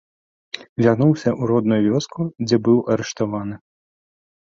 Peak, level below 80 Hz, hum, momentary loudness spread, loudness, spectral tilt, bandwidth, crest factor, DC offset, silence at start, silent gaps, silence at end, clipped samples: -2 dBFS; -56 dBFS; none; 15 LU; -19 LUFS; -7 dB/octave; 7.6 kHz; 18 dB; under 0.1%; 0.55 s; 0.69-0.76 s; 1 s; under 0.1%